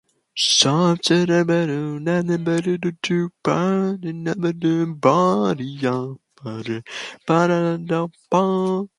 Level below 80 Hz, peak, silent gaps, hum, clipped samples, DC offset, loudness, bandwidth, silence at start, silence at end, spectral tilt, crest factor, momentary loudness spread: -64 dBFS; -2 dBFS; none; none; under 0.1%; under 0.1%; -20 LUFS; 11.5 kHz; 0.35 s; 0.15 s; -5 dB/octave; 18 dB; 12 LU